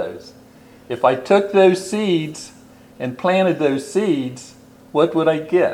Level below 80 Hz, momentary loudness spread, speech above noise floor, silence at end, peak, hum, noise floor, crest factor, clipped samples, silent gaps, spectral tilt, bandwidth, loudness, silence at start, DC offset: -62 dBFS; 16 LU; 28 dB; 0 s; -2 dBFS; none; -45 dBFS; 18 dB; under 0.1%; none; -6 dB/octave; 14 kHz; -18 LUFS; 0 s; under 0.1%